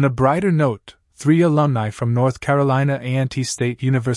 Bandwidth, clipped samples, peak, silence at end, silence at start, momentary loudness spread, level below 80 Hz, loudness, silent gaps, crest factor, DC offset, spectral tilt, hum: 11.5 kHz; under 0.1%; -2 dBFS; 0 s; 0 s; 6 LU; -50 dBFS; -19 LUFS; none; 16 dB; under 0.1%; -7 dB/octave; none